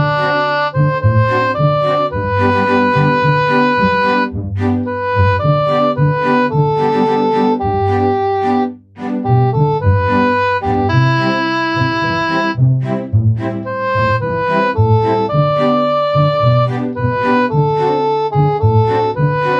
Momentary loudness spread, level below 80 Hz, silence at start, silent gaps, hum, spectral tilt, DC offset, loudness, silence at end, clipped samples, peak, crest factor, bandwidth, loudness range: 4 LU; -40 dBFS; 0 s; none; none; -8.5 dB/octave; under 0.1%; -14 LUFS; 0 s; under 0.1%; -2 dBFS; 12 dB; 7.4 kHz; 1 LU